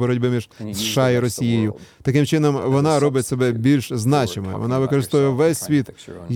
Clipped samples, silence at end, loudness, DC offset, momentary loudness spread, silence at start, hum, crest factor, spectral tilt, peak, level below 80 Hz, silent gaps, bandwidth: under 0.1%; 0 s; -19 LUFS; under 0.1%; 8 LU; 0 s; none; 14 dB; -6 dB/octave; -4 dBFS; -54 dBFS; none; 17.5 kHz